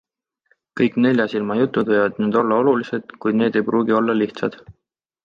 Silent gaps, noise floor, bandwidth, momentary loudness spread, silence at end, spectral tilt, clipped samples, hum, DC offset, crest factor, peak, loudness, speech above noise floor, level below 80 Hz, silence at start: none; -65 dBFS; 7 kHz; 8 LU; 0.55 s; -8 dB/octave; under 0.1%; none; under 0.1%; 16 dB; -4 dBFS; -19 LUFS; 46 dB; -62 dBFS; 0.75 s